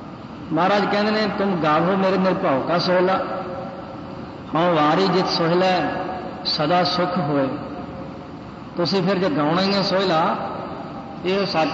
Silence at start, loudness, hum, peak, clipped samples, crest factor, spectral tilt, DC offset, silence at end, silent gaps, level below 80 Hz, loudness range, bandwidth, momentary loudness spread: 0 s; -20 LUFS; none; -8 dBFS; under 0.1%; 14 dB; -6.5 dB/octave; under 0.1%; 0 s; none; -54 dBFS; 3 LU; 7.8 kHz; 15 LU